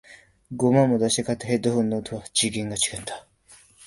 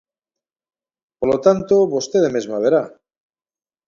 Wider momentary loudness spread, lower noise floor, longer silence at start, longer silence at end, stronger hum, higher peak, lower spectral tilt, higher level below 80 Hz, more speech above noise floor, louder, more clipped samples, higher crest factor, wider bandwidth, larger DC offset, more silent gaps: first, 15 LU vs 5 LU; second, -54 dBFS vs -88 dBFS; second, 0.1 s vs 1.2 s; second, 0 s vs 1 s; neither; second, -4 dBFS vs 0 dBFS; about the same, -4.5 dB/octave vs -5.5 dB/octave; about the same, -56 dBFS vs -56 dBFS; second, 31 dB vs 71 dB; second, -23 LUFS vs -17 LUFS; neither; about the same, 20 dB vs 20 dB; first, 11.5 kHz vs 7.4 kHz; neither; neither